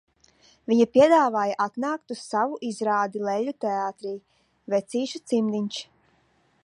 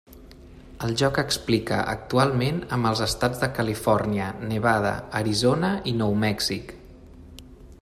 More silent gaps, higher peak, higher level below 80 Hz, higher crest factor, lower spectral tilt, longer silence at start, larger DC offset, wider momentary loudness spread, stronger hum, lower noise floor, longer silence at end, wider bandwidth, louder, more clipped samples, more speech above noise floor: neither; about the same, -6 dBFS vs -6 dBFS; second, -70 dBFS vs -46 dBFS; about the same, 20 dB vs 18 dB; about the same, -5 dB/octave vs -5 dB/octave; first, 0.7 s vs 0.1 s; neither; first, 15 LU vs 6 LU; neither; first, -65 dBFS vs -46 dBFS; first, 0.8 s vs 0.05 s; second, 11 kHz vs 15.5 kHz; about the same, -24 LUFS vs -24 LUFS; neither; first, 41 dB vs 22 dB